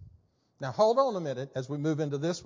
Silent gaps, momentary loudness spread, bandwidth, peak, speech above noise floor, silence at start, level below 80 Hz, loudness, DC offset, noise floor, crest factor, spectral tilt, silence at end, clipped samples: none; 12 LU; 7.6 kHz; -12 dBFS; 35 dB; 0 s; -66 dBFS; -29 LUFS; under 0.1%; -63 dBFS; 18 dB; -6.5 dB/octave; 0 s; under 0.1%